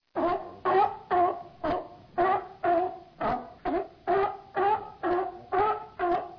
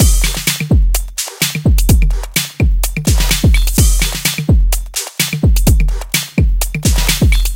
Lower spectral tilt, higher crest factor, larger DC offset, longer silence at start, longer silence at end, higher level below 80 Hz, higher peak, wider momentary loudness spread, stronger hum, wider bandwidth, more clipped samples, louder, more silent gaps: first, -8 dB/octave vs -4 dB/octave; about the same, 14 dB vs 12 dB; neither; first, 0.15 s vs 0 s; about the same, 0 s vs 0 s; second, -56 dBFS vs -14 dBFS; second, -14 dBFS vs 0 dBFS; about the same, 6 LU vs 5 LU; neither; second, 5.4 kHz vs 17.5 kHz; neither; second, -29 LUFS vs -14 LUFS; neither